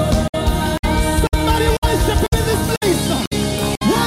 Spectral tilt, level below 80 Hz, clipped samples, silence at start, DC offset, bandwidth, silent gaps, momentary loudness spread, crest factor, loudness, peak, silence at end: -5 dB/octave; -22 dBFS; under 0.1%; 0 s; under 0.1%; 16.5 kHz; 0.29-0.33 s, 0.79-0.83 s, 1.78-1.82 s, 3.27-3.31 s; 3 LU; 14 dB; -17 LUFS; -2 dBFS; 0 s